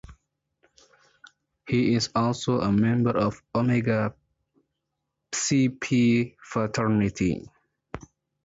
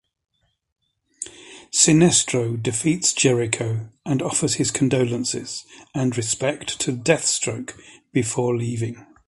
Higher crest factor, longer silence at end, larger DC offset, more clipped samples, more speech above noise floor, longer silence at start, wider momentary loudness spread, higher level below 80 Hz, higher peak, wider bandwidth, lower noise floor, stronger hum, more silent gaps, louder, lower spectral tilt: second, 14 dB vs 22 dB; first, 0.45 s vs 0.25 s; neither; neither; first, 58 dB vs 21 dB; second, 0.1 s vs 1.2 s; second, 10 LU vs 16 LU; about the same, -54 dBFS vs -56 dBFS; second, -12 dBFS vs -2 dBFS; second, 8 kHz vs 11.5 kHz; first, -81 dBFS vs -43 dBFS; neither; neither; second, -25 LUFS vs -21 LUFS; first, -5.5 dB/octave vs -4 dB/octave